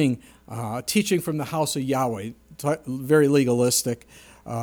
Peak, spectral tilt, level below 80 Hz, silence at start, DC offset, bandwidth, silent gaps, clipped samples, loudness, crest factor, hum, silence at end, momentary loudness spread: -6 dBFS; -5 dB/octave; -58 dBFS; 0 s; under 0.1%; over 20 kHz; none; under 0.1%; -23 LUFS; 18 dB; none; 0 s; 14 LU